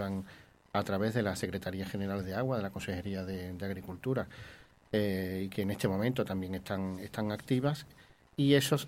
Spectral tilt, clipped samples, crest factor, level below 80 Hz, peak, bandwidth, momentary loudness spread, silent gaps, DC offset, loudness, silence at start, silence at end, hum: -6 dB/octave; under 0.1%; 22 dB; -62 dBFS; -12 dBFS; 16.5 kHz; 8 LU; none; under 0.1%; -34 LUFS; 0 s; 0 s; none